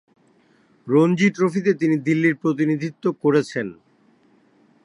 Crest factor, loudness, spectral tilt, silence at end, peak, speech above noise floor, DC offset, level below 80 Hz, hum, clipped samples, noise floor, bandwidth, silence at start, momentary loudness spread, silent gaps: 16 dB; -20 LUFS; -7 dB/octave; 1.1 s; -6 dBFS; 39 dB; under 0.1%; -70 dBFS; none; under 0.1%; -58 dBFS; 11 kHz; 0.85 s; 10 LU; none